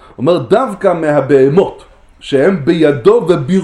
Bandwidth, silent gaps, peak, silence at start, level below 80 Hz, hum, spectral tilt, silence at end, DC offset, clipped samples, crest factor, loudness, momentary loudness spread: 11 kHz; none; 0 dBFS; 0.2 s; -44 dBFS; none; -7.5 dB/octave; 0 s; under 0.1%; 0.1%; 12 dB; -11 LUFS; 5 LU